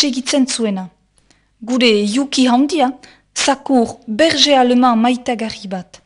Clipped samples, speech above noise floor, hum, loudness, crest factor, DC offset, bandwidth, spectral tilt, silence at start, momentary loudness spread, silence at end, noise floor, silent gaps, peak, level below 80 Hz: under 0.1%; 41 dB; none; -14 LUFS; 16 dB; under 0.1%; 11 kHz; -3.5 dB/octave; 0 s; 15 LU; 0.2 s; -56 dBFS; none; 0 dBFS; -56 dBFS